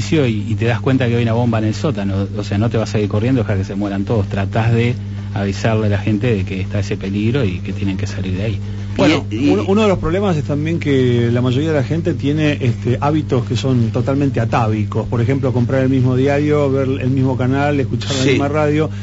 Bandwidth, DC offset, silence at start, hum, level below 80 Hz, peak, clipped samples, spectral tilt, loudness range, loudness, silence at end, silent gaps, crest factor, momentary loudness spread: 8 kHz; under 0.1%; 0 s; 50 Hz at -25 dBFS; -38 dBFS; -4 dBFS; under 0.1%; -7 dB/octave; 3 LU; -17 LUFS; 0 s; none; 12 dB; 6 LU